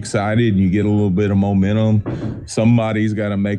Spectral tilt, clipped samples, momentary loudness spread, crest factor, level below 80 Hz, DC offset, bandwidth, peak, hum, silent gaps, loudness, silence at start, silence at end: -7.5 dB/octave; under 0.1%; 4 LU; 12 dB; -44 dBFS; under 0.1%; 10 kHz; -4 dBFS; none; none; -17 LUFS; 0 s; 0 s